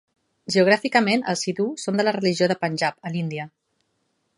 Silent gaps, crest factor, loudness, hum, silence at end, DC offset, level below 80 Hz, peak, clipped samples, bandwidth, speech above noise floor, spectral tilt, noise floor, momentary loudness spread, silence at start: none; 18 dB; -22 LUFS; none; 0.9 s; under 0.1%; -70 dBFS; -4 dBFS; under 0.1%; 11.5 kHz; 50 dB; -4.5 dB/octave; -72 dBFS; 12 LU; 0.5 s